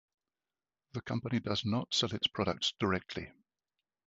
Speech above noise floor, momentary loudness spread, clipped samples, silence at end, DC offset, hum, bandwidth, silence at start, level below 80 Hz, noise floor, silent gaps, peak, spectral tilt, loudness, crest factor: over 56 dB; 13 LU; under 0.1%; 0.8 s; under 0.1%; none; 7.6 kHz; 0.95 s; -60 dBFS; under -90 dBFS; none; -16 dBFS; -3.5 dB/octave; -34 LUFS; 20 dB